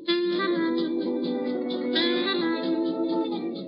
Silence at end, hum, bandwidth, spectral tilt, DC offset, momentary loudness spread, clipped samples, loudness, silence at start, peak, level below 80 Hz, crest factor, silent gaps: 0 s; none; 5.6 kHz; -8 dB/octave; under 0.1%; 5 LU; under 0.1%; -26 LUFS; 0 s; -12 dBFS; under -90 dBFS; 14 dB; none